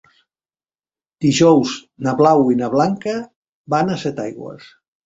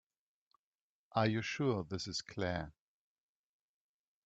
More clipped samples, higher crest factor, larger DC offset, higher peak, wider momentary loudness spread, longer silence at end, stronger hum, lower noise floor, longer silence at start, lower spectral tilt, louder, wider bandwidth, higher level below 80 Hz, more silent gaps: neither; second, 18 dB vs 24 dB; neither; first, 0 dBFS vs -18 dBFS; first, 15 LU vs 7 LU; second, 0.5 s vs 1.55 s; neither; about the same, under -90 dBFS vs under -90 dBFS; about the same, 1.2 s vs 1.15 s; about the same, -6 dB/octave vs -5.5 dB/octave; first, -17 LUFS vs -37 LUFS; about the same, 8 kHz vs 8.2 kHz; first, -58 dBFS vs -68 dBFS; first, 3.36-3.64 s vs none